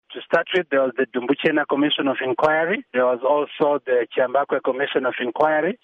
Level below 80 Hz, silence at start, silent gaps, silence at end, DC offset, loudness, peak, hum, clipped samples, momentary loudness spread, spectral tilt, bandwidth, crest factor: -68 dBFS; 0.1 s; none; 0.1 s; under 0.1%; -21 LUFS; -6 dBFS; none; under 0.1%; 3 LU; -6.5 dB/octave; 7.2 kHz; 14 dB